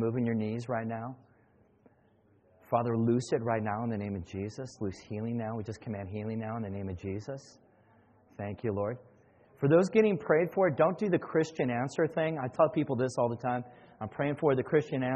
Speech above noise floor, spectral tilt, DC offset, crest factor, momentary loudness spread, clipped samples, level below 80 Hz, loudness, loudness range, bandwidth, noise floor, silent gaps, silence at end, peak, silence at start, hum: 35 dB; -7.5 dB/octave; under 0.1%; 20 dB; 13 LU; under 0.1%; -66 dBFS; -31 LUFS; 10 LU; 8.4 kHz; -66 dBFS; none; 0 s; -12 dBFS; 0 s; none